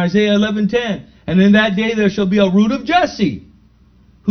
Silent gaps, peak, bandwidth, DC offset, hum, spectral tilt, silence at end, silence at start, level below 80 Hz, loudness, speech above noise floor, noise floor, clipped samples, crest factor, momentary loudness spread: none; 0 dBFS; 6.6 kHz; under 0.1%; none; -6.5 dB/octave; 0 s; 0 s; -46 dBFS; -15 LUFS; 35 dB; -49 dBFS; under 0.1%; 16 dB; 11 LU